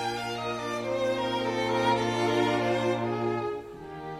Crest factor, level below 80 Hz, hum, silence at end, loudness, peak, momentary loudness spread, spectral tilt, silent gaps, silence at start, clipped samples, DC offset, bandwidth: 14 dB; -60 dBFS; none; 0 s; -28 LUFS; -14 dBFS; 7 LU; -5 dB/octave; none; 0 s; under 0.1%; under 0.1%; 15 kHz